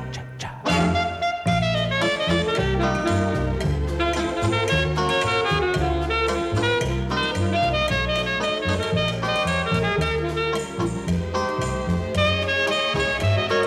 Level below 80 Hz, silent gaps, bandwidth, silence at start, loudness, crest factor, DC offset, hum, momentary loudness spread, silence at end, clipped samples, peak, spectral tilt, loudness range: -36 dBFS; none; 14 kHz; 0 s; -22 LUFS; 14 dB; under 0.1%; none; 4 LU; 0 s; under 0.1%; -8 dBFS; -5 dB/octave; 1 LU